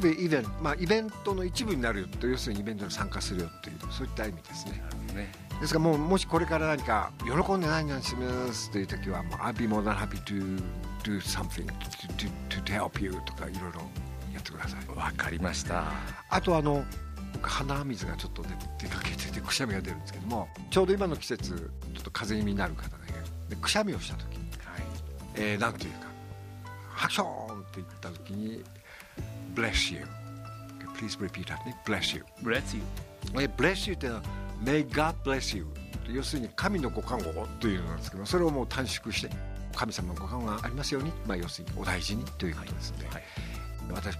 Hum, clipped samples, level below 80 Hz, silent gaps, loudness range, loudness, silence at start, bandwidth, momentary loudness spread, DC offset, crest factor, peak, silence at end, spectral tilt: none; under 0.1%; -42 dBFS; none; 5 LU; -32 LUFS; 0 s; 15.5 kHz; 13 LU; under 0.1%; 22 dB; -10 dBFS; 0 s; -5 dB/octave